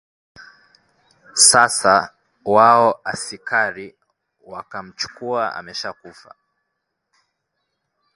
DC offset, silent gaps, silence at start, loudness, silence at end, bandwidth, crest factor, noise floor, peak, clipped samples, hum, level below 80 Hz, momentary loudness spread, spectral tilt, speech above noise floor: under 0.1%; none; 1.35 s; -16 LUFS; 2.05 s; 11.5 kHz; 20 dB; -76 dBFS; 0 dBFS; under 0.1%; none; -62 dBFS; 22 LU; -1 dB/octave; 58 dB